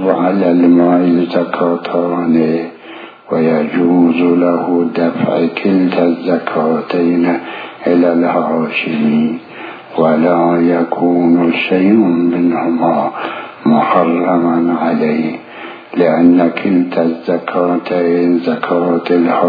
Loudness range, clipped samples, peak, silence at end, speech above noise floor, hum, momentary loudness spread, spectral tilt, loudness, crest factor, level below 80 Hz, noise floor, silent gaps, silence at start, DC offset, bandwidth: 2 LU; under 0.1%; 0 dBFS; 0 s; 21 dB; none; 9 LU; -10 dB/octave; -13 LUFS; 12 dB; -62 dBFS; -32 dBFS; none; 0 s; under 0.1%; 5 kHz